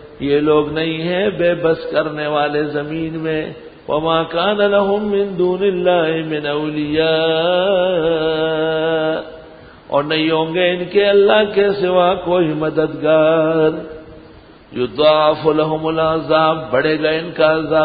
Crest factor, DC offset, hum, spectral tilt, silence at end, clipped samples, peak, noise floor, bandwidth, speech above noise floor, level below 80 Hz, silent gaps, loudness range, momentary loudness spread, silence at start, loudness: 16 dB; under 0.1%; none; -11 dB/octave; 0 s; under 0.1%; 0 dBFS; -42 dBFS; 5 kHz; 26 dB; -48 dBFS; none; 3 LU; 8 LU; 0 s; -16 LUFS